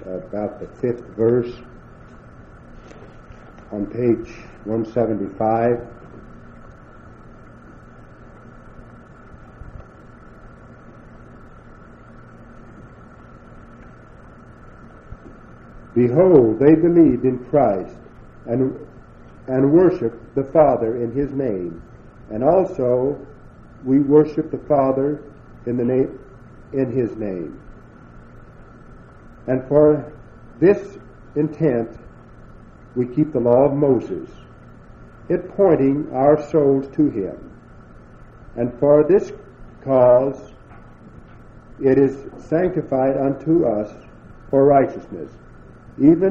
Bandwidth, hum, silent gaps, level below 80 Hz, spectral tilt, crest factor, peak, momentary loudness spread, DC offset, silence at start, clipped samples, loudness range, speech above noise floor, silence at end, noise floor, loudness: 7 kHz; none; none; -46 dBFS; -10.5 dB/octave; 20 dB; 0 dBFS; 20 LU; under 0.1%; 0 s; under 0.1%; 9 LU; 25 dB; 0 s; -43 dBFS; -18 LUFS